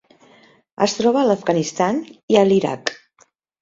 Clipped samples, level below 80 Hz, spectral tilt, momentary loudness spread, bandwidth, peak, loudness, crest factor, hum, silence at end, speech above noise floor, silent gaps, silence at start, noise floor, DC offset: under 0.1%; -62 dBFS; -5 dB/octave; 10 LU; 7.8 kHz; 0 dBFS; -19 LUFS; 20 dB; none; 0.7 s; 41 dB; 2.23-2.28 s; 0.8 s; -58 dBFS; under 0.1%